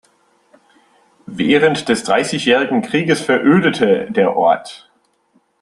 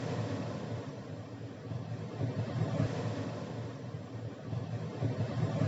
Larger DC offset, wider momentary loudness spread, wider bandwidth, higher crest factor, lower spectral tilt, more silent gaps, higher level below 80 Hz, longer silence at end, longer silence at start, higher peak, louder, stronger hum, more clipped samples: neither; second, 6 LU vs 9 LU; first, 12 kHz vs 8 kHz; about the same, 16 dB vs 18 dB; second, -5 dB/octave vs -7.5 dB/octave; neither; first, -58 dBFS vs -66 dBFS; first, 0.85 s vs 0 s; first, 1.3 s vs 0 s; first, 0 dBFS vs -18 dBFS; first, -15 LUFS vs -38 LUFS; neither; neither